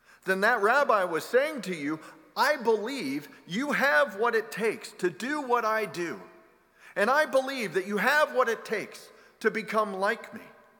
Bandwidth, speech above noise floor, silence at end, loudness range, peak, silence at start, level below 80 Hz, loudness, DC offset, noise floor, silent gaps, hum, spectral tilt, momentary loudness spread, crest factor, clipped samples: 19 kHz; 31 dB; 0.3 s; 2 LU; -10 dBFS; 0.25 s; -80 dBFS; -27 LUFS; under 0.1%; -58 dBFS; none; none; -4 dB/octave; 12 LU; 18 dB; under 0.1%